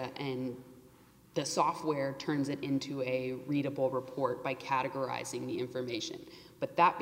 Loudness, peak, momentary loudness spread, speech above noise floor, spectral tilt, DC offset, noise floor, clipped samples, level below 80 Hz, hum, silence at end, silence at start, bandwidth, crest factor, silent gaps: -35 LUFS; -14 dBFS; 9 LU; 26 dB; -5 dB/octave; under 0.1%; -60 dBFS; under 0.1%; -72 dBFS; none; 0 s; 0 s; 16 kHz; 22 dB; none